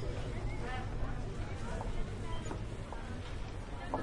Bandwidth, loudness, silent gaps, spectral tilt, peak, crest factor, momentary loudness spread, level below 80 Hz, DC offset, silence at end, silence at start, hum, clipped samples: 11 kHz; -42 LUFS; none; -6 dB/octave; -22 dBFS; 16 dB; 4 LU; -42 dBFS; under 0.1%; 0 s; 0 s; none; under 0.1%